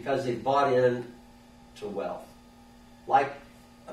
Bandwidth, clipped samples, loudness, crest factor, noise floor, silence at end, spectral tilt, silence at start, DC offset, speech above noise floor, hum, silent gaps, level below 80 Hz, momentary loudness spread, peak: 13.5 kHz; under 0.1%; -27 LUFS; 20 dB; -53 dBFS; 0 s; -6 dB/octave; 0 s; under 0.1%; 26 dB; none; none; -60 dBFS; 20 LU; -10 dBFS